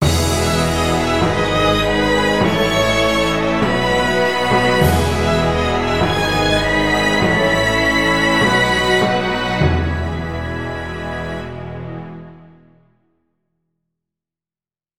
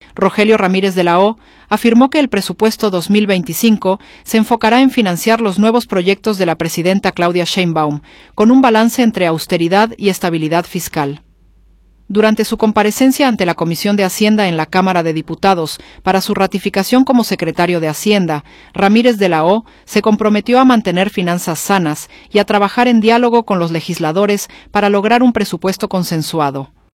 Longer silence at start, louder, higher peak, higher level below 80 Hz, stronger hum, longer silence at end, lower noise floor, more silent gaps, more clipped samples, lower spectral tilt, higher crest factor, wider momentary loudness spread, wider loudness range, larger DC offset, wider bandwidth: second, 0 s vs 0.15 s; second, -16 LUFS vs -13 LUFS; about the same, 0 dBFS vs 0 dBFS; first, -30 dBFS vs -48 dBFS; neither; second, 0 s vs 0.3 s; first, under -90 dBFS vs -48 dBFS; neither; neither; about the same, -4.5 dB/octave vs -5 dB/octave; about the same, 16 dB vs 12 dB; first, 11 LU vs 8 LU; first, 14 LU vs 2 LU; first, 1% vs under 0.1%; about the same, 16.5 kHz vs 16.5 kHz